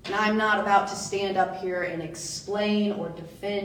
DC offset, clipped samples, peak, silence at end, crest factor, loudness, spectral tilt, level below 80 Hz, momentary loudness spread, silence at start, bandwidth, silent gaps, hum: under 0.1%; under 0.1%; -8 dBFS; 0 s; 20 dB; -26 LUFS; -4 dB/octave; -60 dBFS; 11 LU; 0.05 s; 18 kHz; none; none